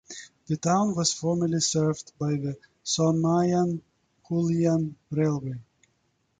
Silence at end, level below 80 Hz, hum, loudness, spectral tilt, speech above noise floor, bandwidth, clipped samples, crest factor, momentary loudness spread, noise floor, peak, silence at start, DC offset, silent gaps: 0.75 s; -62 dBFS; none; -26 LUFS; -5.5 dB/octave; 46 dB; 9.4 kHz; under 0.1%; 16 dB; 13 LU; -71 dBFS; -10 dBFS; 0.1 s; under 0.1%; none